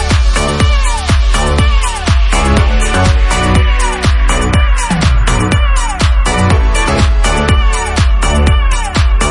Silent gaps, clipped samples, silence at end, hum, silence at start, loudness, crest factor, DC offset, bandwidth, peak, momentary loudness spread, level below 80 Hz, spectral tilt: none; under 0.1%; 0 s; none; 0 s; -12 LUFS; 10 dB; under 0.1%; 11.5 kHz; 0 dBFS; 2 LU; -12 dBFS; -4.5 dB/octave